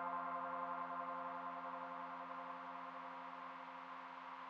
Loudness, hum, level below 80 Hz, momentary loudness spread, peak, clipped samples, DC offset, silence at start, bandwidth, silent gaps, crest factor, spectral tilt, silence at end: -48 LUFS; none; under -90 dBFS; 7 LU; -32 dBFS; under 0.1%; under 0.1%; 0 s; 7.6 kHz; none; 16 dB; -2.5 dB/octave; 0 s